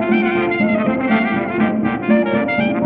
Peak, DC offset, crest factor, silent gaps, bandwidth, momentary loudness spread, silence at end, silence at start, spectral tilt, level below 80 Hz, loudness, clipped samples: -4 dBFS; under 0.1%; 14 dB; none; 4.5 kHz; 2 LU; 0 s; 0 s; -10 dB/octave; -48 dBFS; -17 LUFS; under 0.1%